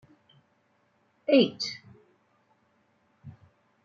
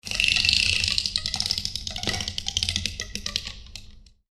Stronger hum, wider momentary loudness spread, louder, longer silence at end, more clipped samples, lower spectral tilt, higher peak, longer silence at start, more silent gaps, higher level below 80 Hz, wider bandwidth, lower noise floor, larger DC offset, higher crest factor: neither; first, 29 LU vs 15 LU; second, -26 LUFS vs -23 LUFS; first, 0.55 s vs 0.25 s; neither; first, -5 dB/octave vs -1 dB/octave; second, -8 dBFS vs 0 dBFS; first, 1.3 s vs 0.05 s; neither; second, -78 dBFS vs -42 dBFS; second, 7.6 kHz vs 15 kHz; first, -69 dBFS vs -47 dBFS; neither; about the same, 24 dB vs 26 dB